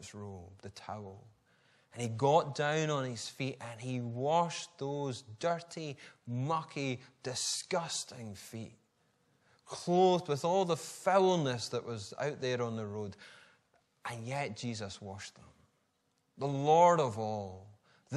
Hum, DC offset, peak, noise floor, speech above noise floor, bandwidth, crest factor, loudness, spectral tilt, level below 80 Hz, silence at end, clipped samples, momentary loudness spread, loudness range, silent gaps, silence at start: none; under 0.1%; -14 dBFS; -77 dBFS; 43 dB; 13 kHz; 22 dB; -34 LUFS; -5 dB/octave; -78 dBFS; 0 s; under 0.1%; 19 LU; 8 LU; none; 0 s